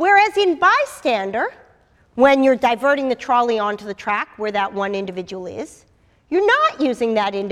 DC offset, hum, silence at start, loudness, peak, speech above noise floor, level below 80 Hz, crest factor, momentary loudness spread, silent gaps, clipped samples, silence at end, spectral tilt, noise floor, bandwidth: under 0.1%; none; 0 s; -18 LUFS; 0 dBFS; 36 dB; -58 dBFS; 18 dB; 15 LU; none; under 0.1%; 0 s; -4.5 dB/octave; -55 dBFS; 13.5 kHz